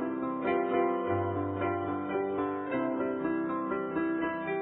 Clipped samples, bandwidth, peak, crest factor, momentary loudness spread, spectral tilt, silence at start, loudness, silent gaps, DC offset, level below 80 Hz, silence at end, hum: under 0.1%; 3.9 kHz; -16 dBFS; 14 dB; 4 LU; -3 dB/octave; 0 s; -31 LUFS; none; under 0.1%; -66 dBFS; 0 s; none